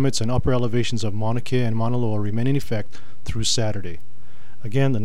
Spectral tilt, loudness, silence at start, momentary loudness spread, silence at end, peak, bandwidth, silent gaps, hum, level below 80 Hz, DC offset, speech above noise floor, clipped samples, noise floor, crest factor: -5.5 dB/octave; -24 LUFS; 0 s; 14 LU; 0 s; -8 dBFS; 13.5 kHz; none; none; -40 dBFS; 10%; 28 dB; under 0.1%; -51 dBFS; 14 dB